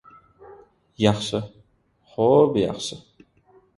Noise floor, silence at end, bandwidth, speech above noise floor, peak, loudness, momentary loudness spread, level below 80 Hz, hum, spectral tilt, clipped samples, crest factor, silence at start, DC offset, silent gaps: -62 dBFS; 0.8 s; 11.5 kHz; 41 dB; -2 dBFS; -22 LUFS; 21 LU; -56 dBFS; none; -6 dB/octave; under 0.1%; 22 dB; 0.5 s; under 0.1%; none